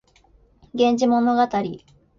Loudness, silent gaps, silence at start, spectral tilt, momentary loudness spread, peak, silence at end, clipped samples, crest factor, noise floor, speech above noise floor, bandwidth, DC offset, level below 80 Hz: -20 LUFS; none; 0.75 s; -5.5 dB/octave; 15 LU; -6 dBFS; 0.4 s; under 0.1%; 16 dB; -56 dBFS; 37 dB; 7.4 kHz; under 0.1%; -58 dBFS